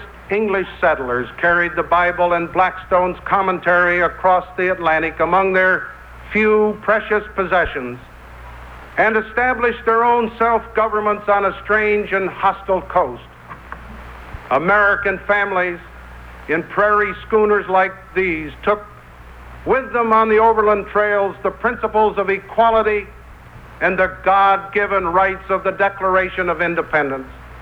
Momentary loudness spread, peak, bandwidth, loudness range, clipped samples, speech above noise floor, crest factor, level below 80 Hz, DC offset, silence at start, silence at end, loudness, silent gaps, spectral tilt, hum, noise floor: 12 LU; -4 dBFS; 7 kHz; 3 LU; under 0.1%; 22 dB; 14 dB; -42 dBFS; under 0.1%; 0 s; 0 s; -17 LUFS; none; -7 dB/octave; none; -39 dBFS